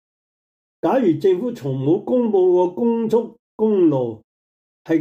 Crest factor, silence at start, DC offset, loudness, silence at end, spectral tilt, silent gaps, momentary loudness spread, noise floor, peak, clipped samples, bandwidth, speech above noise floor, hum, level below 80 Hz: 12 dB; 0.85 s; under 0.1%; -19 LUFS; 0 s; -9 dB/octave; 3.39-3.58 s, 4.24-4.85 s; 8 LU; under -90 dBFS; -6 dBFS; under 0.1%; 8 kHz; over 72 dB; none; -68 dBFS